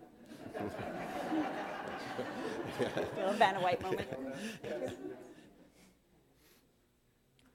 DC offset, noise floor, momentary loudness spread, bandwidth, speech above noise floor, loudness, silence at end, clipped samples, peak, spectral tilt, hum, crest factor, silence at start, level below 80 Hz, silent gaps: under 0.1%; -72 dBFS; 18 LU; 17 kHz; 37 dB; -37 LUFS; 1.65 s; under 0.1%; -14 dBFS; -5 dB/octave; none; 26 dB; 0 s; -70 dBFS; none